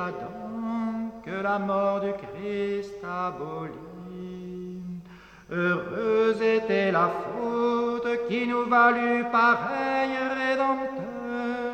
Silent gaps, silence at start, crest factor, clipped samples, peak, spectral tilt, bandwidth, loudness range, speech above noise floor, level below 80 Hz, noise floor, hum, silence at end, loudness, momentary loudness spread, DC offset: none; 0 s; 18 dB; under 0.1%; -10 dBFS; -6.5 dB/octave; 8.8 kHz; 9 LU; 22 dB; -62 dBFS; -48 dBFS; none; 0 s; -26 LUFS; 16 LU; under 0.1%